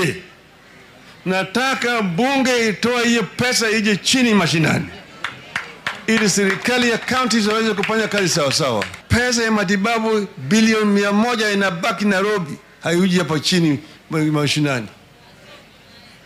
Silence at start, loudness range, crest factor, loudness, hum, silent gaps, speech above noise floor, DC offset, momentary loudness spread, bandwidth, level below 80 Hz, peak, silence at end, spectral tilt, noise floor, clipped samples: 0 s; 2 LU; 14 dB; -18 LUFS; none; none; 28 dB; under 0.1%; 10 LU; 16 kHz; -50 dBFS; -4 dBFS; 0.7 s; -4 dB/octave; -46 dBFS; under 0.1%